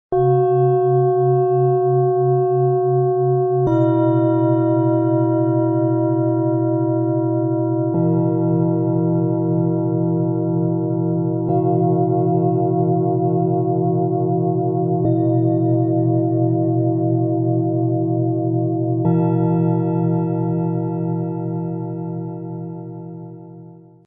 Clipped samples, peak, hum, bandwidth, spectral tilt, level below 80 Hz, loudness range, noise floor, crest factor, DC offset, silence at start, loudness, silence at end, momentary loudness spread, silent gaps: under 0.1%; -6 dBFS; none; 3.5 kHz; -14 dB/octave; -56 dBFS; 3 LU; -41 dBFS; 12 dB; under 0.1%; 0.1 s; -18 LUFS; 0.3 s; 6 LU; none